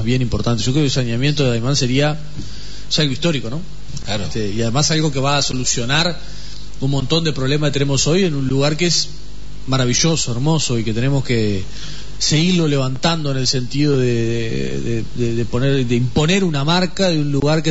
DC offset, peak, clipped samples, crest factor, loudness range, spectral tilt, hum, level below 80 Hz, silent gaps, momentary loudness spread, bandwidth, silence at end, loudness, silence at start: 7%; -4 dBFS; under 0.1%; 14 dB; 2 LU; -4.5 dB/octave; none; -36 dBFS; none; 13 LU; 8 kHz; 0 s; -18 LUFS; 0 s